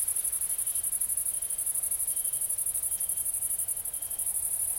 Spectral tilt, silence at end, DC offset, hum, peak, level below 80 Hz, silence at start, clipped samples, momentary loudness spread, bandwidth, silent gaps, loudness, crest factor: 1 dB/octave; 0 s; under 0.1%; none; -14 dBFS; -60 dBFS; 0 s; under 0.1%; 2 LU; 17 kHz; none; -28 LUFS; 16 dB